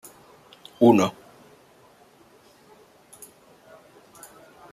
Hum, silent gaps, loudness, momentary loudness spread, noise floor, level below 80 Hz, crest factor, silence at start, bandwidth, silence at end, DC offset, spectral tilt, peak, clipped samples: none; none; -20 LUFS; 30 LU; -55 dBFS; -70 dBFS; 24 dB; 0.8 s; 15 kHz; 3.6 s; under 0.1%; -6 dB/octave; -4 dBFS; under 0.1%